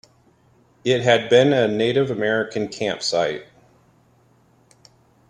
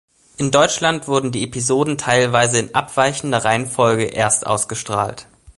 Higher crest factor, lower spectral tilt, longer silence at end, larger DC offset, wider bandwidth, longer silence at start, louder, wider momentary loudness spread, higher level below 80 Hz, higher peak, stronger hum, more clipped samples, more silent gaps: about the same, 20 dB vs 18 dB; first, -5 dB/octave vs -3.5 dB/octave; first, 1.85 s vs 0.35 s; neither; about the same, 10.5 kHz vs 11.5 kHz; first, 0.85 s vs 0.4 s; second, -20 LUFS vs -17 LUFS; first, 11 LU vs 6 LU; second, -62 dBFS vs -50 dBFS; about the same, -2 dBFS vs 0 dBFS; neither; neither; neither